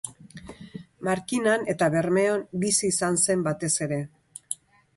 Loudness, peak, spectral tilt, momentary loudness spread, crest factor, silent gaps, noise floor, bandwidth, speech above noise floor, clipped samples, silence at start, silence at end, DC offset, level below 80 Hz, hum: -25 LUFS; -6 dBFS; -4 dB/octave; 21 LU; 20 dB; none; -45 dBFS; 12 kHz; 20 dB; under 0.1%; 0.05 s; 0.4 s; under 0.1%; -62 dBFS; none